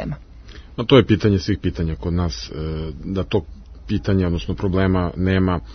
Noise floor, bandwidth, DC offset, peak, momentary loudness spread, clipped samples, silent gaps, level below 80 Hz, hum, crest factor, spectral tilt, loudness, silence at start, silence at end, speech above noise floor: -40 dBFS; 6.4 kHz; under 0.1%; 0 dBFS; 13 LU; under 0.1%; none; -36 dBFS; none; 20 dB; -7.5 dB/octave; -20 LUFS; 0 s; 0 s; 20 dB